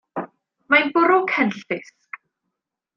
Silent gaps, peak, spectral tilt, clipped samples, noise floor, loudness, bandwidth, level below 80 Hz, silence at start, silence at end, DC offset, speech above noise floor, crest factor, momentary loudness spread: none; -2 dBFS; -5.5 dB/octave; under 0.1%; -81 dBFS; -19 LUFS; 7.2 kHz; -74 dBFS; 0.15 s; 1.15 s; under 0.1%; 62 dB; 20 dB; 23 LU